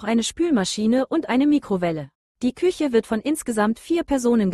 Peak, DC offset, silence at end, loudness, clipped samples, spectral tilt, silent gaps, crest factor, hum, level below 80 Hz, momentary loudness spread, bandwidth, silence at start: -8 dBFS; under 0.1%; 0 s; -22 LUFS; under 0.1%; -5 dB/octave; 2.15-2.35 s; 14 dB; none; -52 dBFS; 7 LU; 12.5 kHz; 0 s